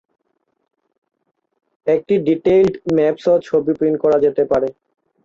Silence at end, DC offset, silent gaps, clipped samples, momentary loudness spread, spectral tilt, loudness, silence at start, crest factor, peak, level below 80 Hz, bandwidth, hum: 0.55 s; under 0.1%; none; under 0.1%; 5 LU; -8 dB/octave; -17 LUFS; 1.85 s; 14 dB; -4 dBFS; -52 dBFS; 7.4 kHz; none